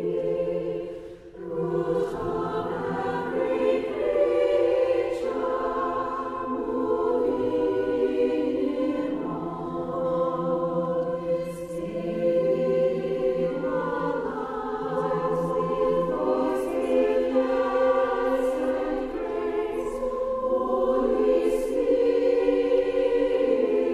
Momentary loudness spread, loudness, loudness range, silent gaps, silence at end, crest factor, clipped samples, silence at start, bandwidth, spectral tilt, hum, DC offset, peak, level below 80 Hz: 8 LU; -26 LUFS; 4 LU; none; 0 s; 14 dB; under 0.1%; 0 s; 12 kHz; -7 dB/octave; none; under 0.1%; -10 dBFS; -50 dBFS